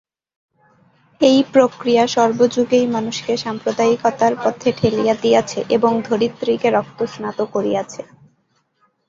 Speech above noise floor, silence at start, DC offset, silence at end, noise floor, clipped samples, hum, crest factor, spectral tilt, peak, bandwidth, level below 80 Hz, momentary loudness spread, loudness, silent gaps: 47 dB; 1.2 s; under 0.1%; 1.05 s; -64 dBFS; under 0.1%; none; 16 dB; -5 dB/octave; -2 dBFS; 7.6 kHz; -58 dBFS; 8 LU; -17 LUFS; none